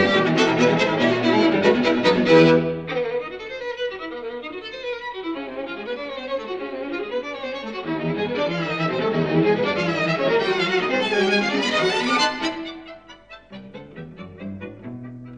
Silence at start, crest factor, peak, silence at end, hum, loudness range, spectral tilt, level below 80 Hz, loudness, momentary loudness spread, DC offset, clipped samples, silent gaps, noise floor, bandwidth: 0 s; 20 dB; -2 dBFS; 0 s; none; 11 LU; -5.5 dB/octave; -58 dBFS; -21 LUFS; 18 LU; under 0.1%; under 0.1%; none; -44 dBFS; 10 kHz